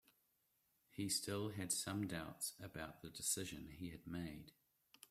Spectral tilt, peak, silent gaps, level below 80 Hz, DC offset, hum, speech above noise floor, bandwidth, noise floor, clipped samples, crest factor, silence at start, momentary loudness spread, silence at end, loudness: -3 dB/octave; -26 dBFS; none; -72 dBFS; under 0.1%; none; 36 dB; 16 kHz; -82 dBFS; under 0.1%; 20 dB; 0.95 s; 12 LU; 0.6 s; -45 LUFS